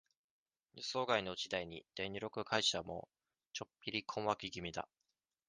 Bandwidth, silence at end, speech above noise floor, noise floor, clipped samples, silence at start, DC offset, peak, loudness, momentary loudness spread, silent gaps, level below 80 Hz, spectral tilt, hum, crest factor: 10 kHz; 0.65 s; 48 dB; -88 dBFS; under 0.1%; 0.75 s; under 0.1%; -18 dBFS; -40 LUFS; 14 LU; 3.47-3.51 s; -70 dBFS; -3 dB/octave; none; 26 dB